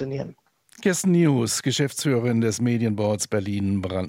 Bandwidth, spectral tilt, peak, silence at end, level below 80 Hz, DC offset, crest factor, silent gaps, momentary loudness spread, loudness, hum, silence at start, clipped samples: 16.5 kHz; -5 dB/octave; -8 dBFS; 0 s; -64 dBFS; under 0.1%; 14 dB; none; 7 LU; -23 LUFS; none; 0 s; under 0.1%